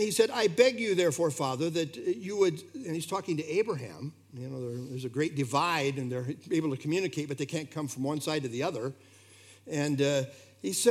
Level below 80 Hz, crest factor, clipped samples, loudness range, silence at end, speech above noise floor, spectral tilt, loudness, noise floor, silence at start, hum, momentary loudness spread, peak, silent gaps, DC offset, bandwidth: -82 dBFS; 22 dB; under 0.1%; 4 LU; 0 s; 26 dB; -4.5 dB/octave; -30 LUFS; -56 dBFS; 0 s; none; 12 LU; -10 dBFS; none; under 0.1%; 16 kHz